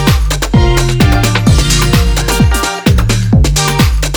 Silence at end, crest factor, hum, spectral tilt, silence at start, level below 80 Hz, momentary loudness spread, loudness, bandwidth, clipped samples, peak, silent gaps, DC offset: 0 s; 8 dB; none; -4.5 dB/octave; 0 s; -14 dBFS; 2 LU; -10 LUFS; over 20 kHz; under 0.1%; 0 dBFS; none; under 0.1%